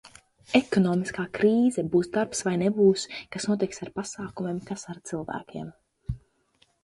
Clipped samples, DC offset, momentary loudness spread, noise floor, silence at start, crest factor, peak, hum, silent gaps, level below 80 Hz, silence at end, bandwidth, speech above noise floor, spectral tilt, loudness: under 0.1%; under 0.1%; 16 LU; -66 dBFS; 0.5 s; 20 dB; -6 dBFS; none; none; -54 dBFS; 0.65 s; 11.5 kHz; 41 dB; -5.5 dB/octave; -26 LUFS